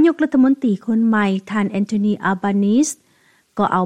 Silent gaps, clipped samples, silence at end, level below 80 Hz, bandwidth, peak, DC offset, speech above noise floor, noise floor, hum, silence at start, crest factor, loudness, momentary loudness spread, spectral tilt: none; under 0.1%; 0 s; -62 dBFS; 12.5 kHz; -4 dBFS; 0.1%; 40 dB; -57 dBFS; none; 0 s; 14 dB; -18 LUFS; 7 LU; -6 dB/octave